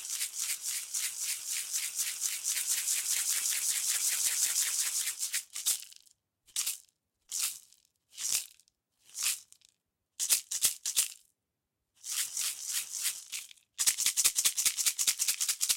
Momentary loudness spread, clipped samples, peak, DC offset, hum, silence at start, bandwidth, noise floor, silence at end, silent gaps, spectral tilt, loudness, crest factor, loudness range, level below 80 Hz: 11 LU; under 0.1%; -12 dBFS; under 0.1%; none; 0 s; 17 kHz; -86 dBFS; 0 s; none; 4.5 dB/octave; -30 LUFS; 24 dB; 7 LU; -78 dBFS